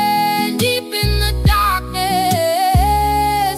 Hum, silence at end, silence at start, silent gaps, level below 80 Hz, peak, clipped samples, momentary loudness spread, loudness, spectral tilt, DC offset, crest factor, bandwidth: none; 0 s; 0 s; none; -22 dBFS; -4 dBFS; under 0.1%; 3 LU; -16 LUFS; -4.5 dB/octave; under 0.1%; 12 dB; 16 kHz